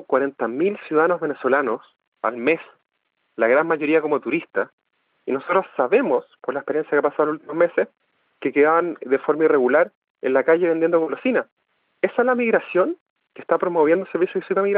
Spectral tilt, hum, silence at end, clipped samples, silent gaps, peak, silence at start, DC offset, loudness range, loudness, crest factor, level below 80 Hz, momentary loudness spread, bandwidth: -10 dB/octave; none; 0 s; under 0.1%; 2.07-2.12 s, 4.73-4.78 s, 9.95-10.02 s, 10.10-10.15 s, 11.52-11.57 s, 13.01-13.16 s; -6 dBFS; 0.1 s; under 0.1%; 3 LU; -21 LUFS; 14 dB; -80 dBFS; 10 LU; 4.4 kHz